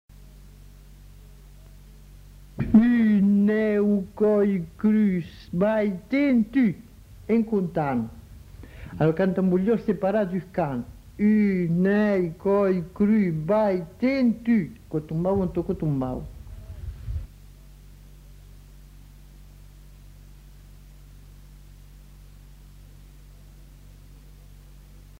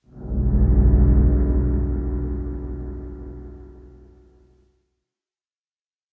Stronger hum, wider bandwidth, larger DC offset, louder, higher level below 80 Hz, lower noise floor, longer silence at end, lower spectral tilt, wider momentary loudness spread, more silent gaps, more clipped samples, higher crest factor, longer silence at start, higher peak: neither; first, 6.8 kHz vs 2 kHz; neither; about the same, -23 LUFS vs -21 LUFS; second, -46 dBFS vs -22 dBFS; second, -47 dBFS vs under -90 dBFS; second, 0.25 s vs 2.25 s; second, -9 dB/octave vs -14 dB/octave; second, 16 LU vs 21 LU; neither; neither; about the same, 20 dB vs 16 dB; about the same, 0.2 s vs 0.15 s; about the same, -6 dBFS vs -6 dBFS